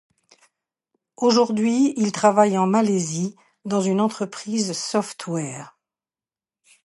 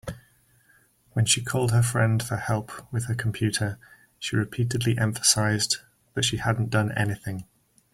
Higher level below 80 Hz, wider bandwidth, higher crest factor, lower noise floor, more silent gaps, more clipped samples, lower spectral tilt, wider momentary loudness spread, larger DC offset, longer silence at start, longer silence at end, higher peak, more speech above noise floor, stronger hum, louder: second, -72 dBFS vs -54 dBFS; second, 11.5 kHz vs 15.5 kHz; about the same, 20 dB vs 22 dB; first, under -90 dBFS vs -61 dBFS; neither; neither; about the same, -5 dB/octave vs -4 dB/octave; about the same, 11 LU vs 12 LU; neither; first, 1.2 s vs 0.05 s; first, 1.15 s vs 0.5 s; first, -2 dBFS vs -6 dBFS; first, over 69 dB vs 37 dB; neither; first, -21 LUFS vs -25 LUFS